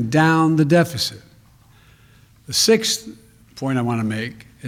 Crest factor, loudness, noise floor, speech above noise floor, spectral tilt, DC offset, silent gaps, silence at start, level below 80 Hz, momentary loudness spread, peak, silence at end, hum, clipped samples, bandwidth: 18 dB; -18 LUFS; -51 dBFS; 33 dB; -4.5 dB/octave; under 0.1%; none; 0 s; -56 dBFS; 13 LU; -4 dBFS; 0 s; none; under 0.1%; 16.5 kHz